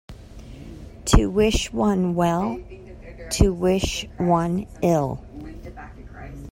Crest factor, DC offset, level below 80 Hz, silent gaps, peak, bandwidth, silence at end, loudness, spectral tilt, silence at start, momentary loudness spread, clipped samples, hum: 22 dB; under 0.1%; -32 dBFS; none; 0 dBFS; 16 kHz; 0 s; -22 LUFS; -5.5 dB/octave; 0.1 s; 21 LU; under 0.1%; none